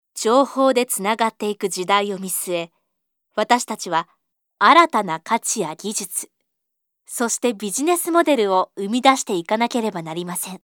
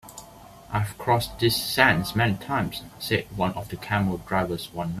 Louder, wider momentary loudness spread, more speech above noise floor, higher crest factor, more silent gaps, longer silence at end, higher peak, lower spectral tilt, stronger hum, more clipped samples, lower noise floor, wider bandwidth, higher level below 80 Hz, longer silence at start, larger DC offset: first, -20 LUFS vs -25 LUFS; about the same, 10 LU vs 12 LU; first, 58 dB vs 22 dB; about the same, 20 dB vs 24 dB; neither; about the same, 0.05 s vs 0 s; about the same, 0 dBFS vs -2 dBFS; second, -3 dB/octave vs -5 dB/octave; neither; neither; first, -77 dBFS vs -47 dBFS; first, over 20 kHz vs 16 kHz; second, -74 dBFS vs -48 dBFS; about the same, 0.15 s vs 0.05 s; neither